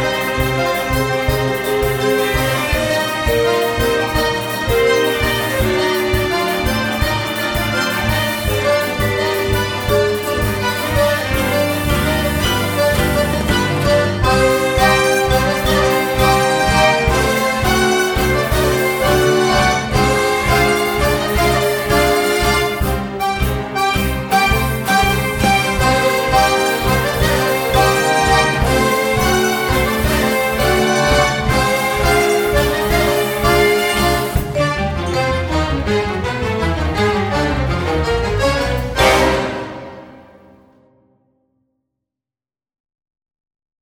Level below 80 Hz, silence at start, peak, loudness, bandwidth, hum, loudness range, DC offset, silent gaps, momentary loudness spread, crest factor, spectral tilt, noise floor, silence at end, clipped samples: -26 dBFS; 0 s; 0 dBFS; -15 LUFS; over 20 kHz; none; 4 LU; under 0.1%; none; 5 LU; 16 dB; -4.5 dB/octave; under -90 dBFS; 3.6 s; under 0.1%